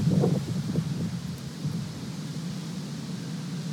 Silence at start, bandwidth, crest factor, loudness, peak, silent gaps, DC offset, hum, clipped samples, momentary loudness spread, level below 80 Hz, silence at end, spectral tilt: 0 s; 16 kHz; 18 dB; -31 LUFS; -12 dBFS; none; under 0.1%; none; under 0.1%; 9 LU; -56 dBFS; 0 s; -7 dB/octave